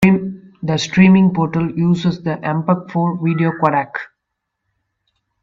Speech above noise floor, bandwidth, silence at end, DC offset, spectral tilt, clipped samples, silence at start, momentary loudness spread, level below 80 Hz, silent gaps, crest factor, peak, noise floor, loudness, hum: 62 dB; 7.6 kHz; 1.4 s; under 0.1%; -7 dB/octave; under 0.1%; 0 s; 15 LU; -52 dBFS; none; 16 dB; 0 dBFS; -77 dBFS; -16 LUFS; none